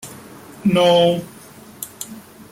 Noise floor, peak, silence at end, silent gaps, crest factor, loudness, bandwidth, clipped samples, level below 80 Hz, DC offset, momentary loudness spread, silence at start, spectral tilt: -42 dBFS; -4 dBFS; 0.1 s; none; 16 dB; -16 LUFS; 16.5 kHz; under 0.1%; -58 dBFS; under 0.1%; 25 LU; 0.05 s; -5 dB/octave